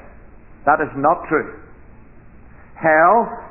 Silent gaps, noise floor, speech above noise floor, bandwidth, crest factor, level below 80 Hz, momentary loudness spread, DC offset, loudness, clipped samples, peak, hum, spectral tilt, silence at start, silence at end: none; -43 dBFS; 27 dB; 3 kHz; 18 dB; -46 dBFS; 9 LU; 0.4%; -17 LUFS; under 0.1%; -2 dBFS; none; -11.5 dB/octave; 0.65 s; 0 s